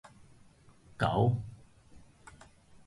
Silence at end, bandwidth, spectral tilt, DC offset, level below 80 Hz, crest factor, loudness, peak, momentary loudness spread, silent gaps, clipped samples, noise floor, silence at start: 0.9 s; 11.5 kHz; -7.5 dB/octave; under 0.1%; -56 dBFS; 20 dB; -31 LUFS; -16 dBFS; 27 LU; none; under 0.1%; -60 dBFS; 0.05 s